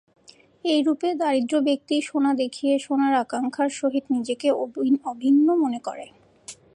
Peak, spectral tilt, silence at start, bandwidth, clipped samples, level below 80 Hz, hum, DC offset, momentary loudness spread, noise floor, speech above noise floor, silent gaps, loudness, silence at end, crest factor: -10 dBFS; -4 dB/octave; 0.65 s; 11 kHz; under 0.1%; -74 dBFS; none; under 0.1%; 7 LU; -46 dBFS; 24 dB; none; -23 LUFS; 0.2 s; 14 dB